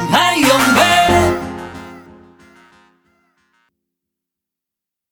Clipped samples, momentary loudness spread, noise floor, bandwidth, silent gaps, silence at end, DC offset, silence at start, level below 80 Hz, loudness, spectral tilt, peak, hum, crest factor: under 0.1%; 20 LU; -85 dBFS; over 20 kHz; none; 3.1 s; under 0.1%; 0 s; -40 dBFS; -12 LUFS; -3.5 dB/octave; 0 dBFS; none; 16 dB